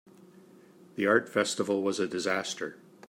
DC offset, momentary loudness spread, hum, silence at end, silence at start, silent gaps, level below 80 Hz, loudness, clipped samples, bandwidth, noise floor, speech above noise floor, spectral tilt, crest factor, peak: under 0.1%; 12 LU; none; 0.35 s; 0.95 s; none; -78 dBFS; -29 LUFS; under 0.1%; 16 kHz; -55 dBFS; 27 dB; -3.5 dB/octave; 22 dB; -8 dBFS